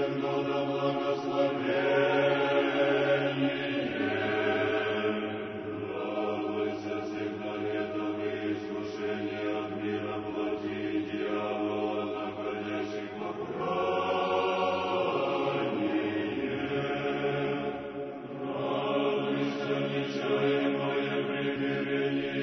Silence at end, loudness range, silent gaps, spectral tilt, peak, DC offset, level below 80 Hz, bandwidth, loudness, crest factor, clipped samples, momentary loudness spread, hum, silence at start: 0 s; 6 LU; none; -6.5 dB/octave; -14 dBFS; under 0.1%; -68 dBFS; 6.4 kHz; -30 LUFS; 16 dB; under 0.1%; 8 LU; none; 0 s